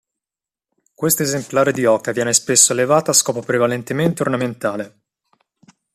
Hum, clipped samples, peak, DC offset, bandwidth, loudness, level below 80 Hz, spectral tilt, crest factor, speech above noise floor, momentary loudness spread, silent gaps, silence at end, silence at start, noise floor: none; under 0.1%; 0 dBFS; under 0.1%; 15 kHz; -16 LUFS; -60 dBFS; -3 dB/octave; 18 dB; 72 dB; 11 LU; none; 1.05 s; 1 s; -90 dBFS